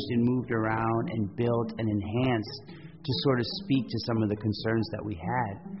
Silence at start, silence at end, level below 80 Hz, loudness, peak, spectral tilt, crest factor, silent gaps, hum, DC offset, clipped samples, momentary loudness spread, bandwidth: 0 s; 0 s; -56 dBFS; -29 LUFS; -14 dBFS; -5.5 dB/octave; 14 dB; none; none; 0.1%; under 0.1%; 8 LU; 6 kHz